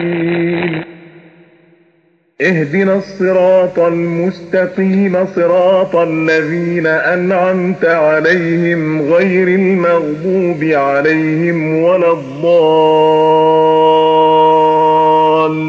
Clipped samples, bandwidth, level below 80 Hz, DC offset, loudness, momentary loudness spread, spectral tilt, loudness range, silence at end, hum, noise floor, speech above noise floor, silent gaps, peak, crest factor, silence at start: under 0.1%; 7.4 kHz; -56 dBFS; under 0.1%; -12 LUFS; 6 LU; -7.5 dB/octave; 5 LU; 0 s; none; -54 dBFS; 43 dB; none; 0 dBFS; 10 dB; 0 s